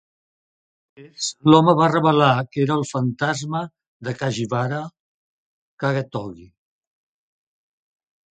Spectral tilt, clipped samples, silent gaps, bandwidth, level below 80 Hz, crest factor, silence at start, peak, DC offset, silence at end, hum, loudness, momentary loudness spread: -6 dB/octave; under 0.1%; 3.87-4.00 s, 5.00-5.78 s; 9.4 kHz; -62 dBFS; 22 dB; 1 s; 0 dBFS; under 0.1%; 1.85 s; none; -20 LUFS; 17 LU